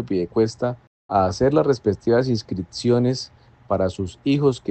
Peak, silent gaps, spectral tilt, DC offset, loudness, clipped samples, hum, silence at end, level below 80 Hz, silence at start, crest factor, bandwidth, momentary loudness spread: -4 dBFS; 0.87-1.09 s; -7 dB/octave; under 0.1%; -22 LUFS; under 0.1%; none; 0 s; -50 dBFS; 0 s; 16 dB; 8.8 kHz; 9 LU